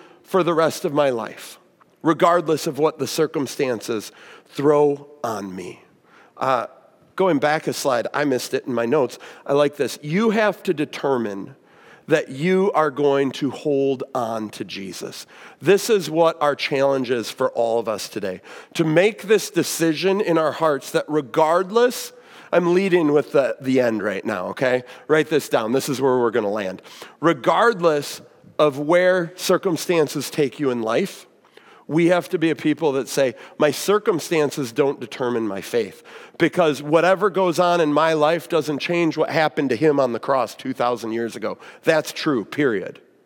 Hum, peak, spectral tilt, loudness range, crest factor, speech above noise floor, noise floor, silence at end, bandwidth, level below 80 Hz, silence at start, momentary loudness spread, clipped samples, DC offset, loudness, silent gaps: none; -2 dBFS; -5 dB/octave; 3 LU; 18 dB; 32 dB; -52 dBFS; 0.35 s; 18 kHz; -78 dBFS; 0.3 s; 12 LU; under 0.1%; under 0.1%; -21 LUFS; none